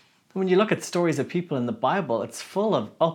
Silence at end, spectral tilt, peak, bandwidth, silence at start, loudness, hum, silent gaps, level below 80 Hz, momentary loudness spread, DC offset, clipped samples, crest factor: 0 s; -6 dB/octave; -6 dBFS; 17.5 kHz; 0.35 s; -25 LUFS; none; none; -80 dBFS; 7 LU; under 0.1%; under 0.1%; 18 dB